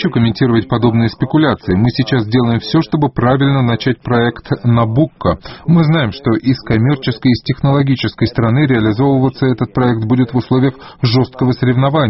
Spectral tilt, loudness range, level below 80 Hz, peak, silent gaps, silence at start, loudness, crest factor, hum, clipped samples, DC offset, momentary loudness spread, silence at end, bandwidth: -6.5 dB/octave; 1 LU; -38 dBFS; 0 dBFS; none; 0 s; -14 LUFS; 12 dB; none; under 0.1%; under 0.1%; 3 LU; 0 s; 6 kHz